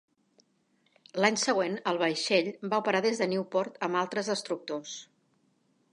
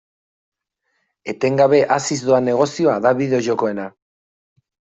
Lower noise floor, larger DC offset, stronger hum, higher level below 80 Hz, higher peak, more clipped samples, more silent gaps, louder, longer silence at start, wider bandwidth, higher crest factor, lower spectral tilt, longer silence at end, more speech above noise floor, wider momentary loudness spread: about the same, -71 dBFS vs -71 dBFS; neither; neither; second, -84 dBFS vs -62 dBFS; second, -8 dBFS vs -2 dBFS; neither; neither; second, -29 LUFS vs -17 LUFS; about the same, 1.15 s vs 1.25 s; first, 11.5 kHz vs 8.2 kHz; first, 22 dB vs 16 dB; second, -3.5 dB/octave vs -5.5 dB/octave; second, 0.9 s vs 1.1 s; second, 42 dB vs 54 dB; second, 11 LU vs 15 LU